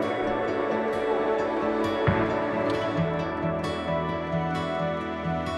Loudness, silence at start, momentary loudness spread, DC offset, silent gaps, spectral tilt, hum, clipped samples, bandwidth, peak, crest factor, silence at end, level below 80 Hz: -27 LUFS; 0 s; 4 LU; under 0.1%; none; -7 dB/octave; none; under 0.1%; 12 kHz; -10 dBFS; 16 dB; 0 s; -48 dBFS